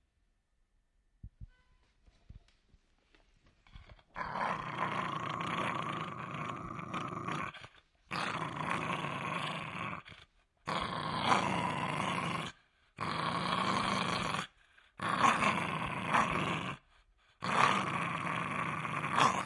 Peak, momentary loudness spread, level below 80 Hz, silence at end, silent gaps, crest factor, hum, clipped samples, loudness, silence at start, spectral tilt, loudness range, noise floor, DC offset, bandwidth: -10 dBFS; 13 LU; -64 dBFS; 0 s; none; 26 dB; none; under 0.1%; -35 LUFS; 1.25 s; -4.5 dB/octave; 7 LU; -76 dBFS; under 0.1%; 11.5 kHz